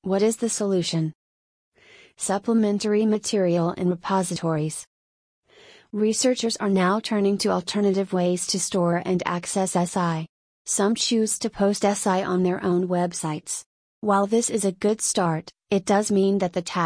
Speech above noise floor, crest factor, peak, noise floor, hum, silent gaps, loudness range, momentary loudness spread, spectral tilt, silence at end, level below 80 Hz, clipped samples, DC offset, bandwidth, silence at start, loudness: 30 dB; 16 dB; -8 dBFS; -52 dBFS; none; 1.15-1.72 s, 4.87-5.43 s, 10.29-10.65 s, 13.66-14.02 s; 2 LU; 7 LU; -4.5 dB/octave; 0 s; -64 dBFS; under 0.1%; under 0.1%; 10.5 kHz; 0.05 s; -23 LUFS